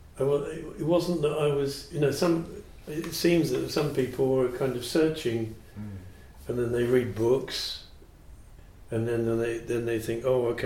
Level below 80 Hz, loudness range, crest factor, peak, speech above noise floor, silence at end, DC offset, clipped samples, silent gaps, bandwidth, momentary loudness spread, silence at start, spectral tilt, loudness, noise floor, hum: -50 dBFS; 3 LU; 18 dB; -10 dBFS; 22 dB; 0 s; under 0.1%; under 0.1%; none; 16.5 kHz; 13 LU; 0 s; -6 dB/octave; -28 LUFS; -49 dBFS; none